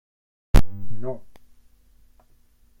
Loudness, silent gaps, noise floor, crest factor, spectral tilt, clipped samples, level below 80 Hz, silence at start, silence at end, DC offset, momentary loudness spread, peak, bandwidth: -28 LUFS; none; -56 dBFS; 18 dB; -6.5 dB/octave; under 0.1%; -28 dBFS; 0.55 s; 1.55 s; under 0.1%; 16 LU; -2 dBFS; 16.5 kHz